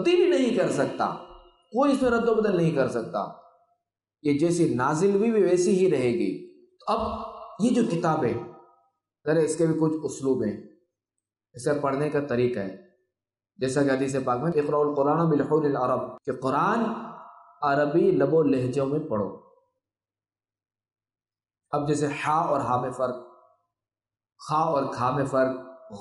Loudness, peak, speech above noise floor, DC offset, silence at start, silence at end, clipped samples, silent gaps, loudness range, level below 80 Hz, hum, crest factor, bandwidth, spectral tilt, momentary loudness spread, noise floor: -25 LUFS; -12 dBFS; over 66 dB; under 0.1%; 0 s; 0 s; under 0.1%; none; 5 LU; -60 dBFS; none; 14 dB; 11.5 kHz; -6.5 dB/octave; 11 LU; under -90 dBFS